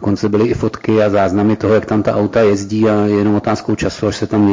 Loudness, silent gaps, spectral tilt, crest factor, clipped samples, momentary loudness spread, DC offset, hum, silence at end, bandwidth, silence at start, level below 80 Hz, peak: -14 LUFS; none; -7 dB/octave; 10 dB; under 0.1%; 5 LU; under 0.1%; none; 0 s; 7.6 kHz; 0 s; -38 dBFS; -4 dBFS